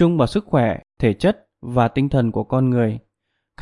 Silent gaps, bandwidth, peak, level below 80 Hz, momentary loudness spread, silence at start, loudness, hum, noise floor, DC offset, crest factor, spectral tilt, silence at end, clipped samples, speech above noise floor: none; 11.5 kHz; -2 dBFS; -44 dBFS; 6 LU; 0 s; -20 LUFS; none; -75 dBFS; under 0.1%; 16 dB; -8.5 dB/octave; 0 s; under 0.1%; 57 dB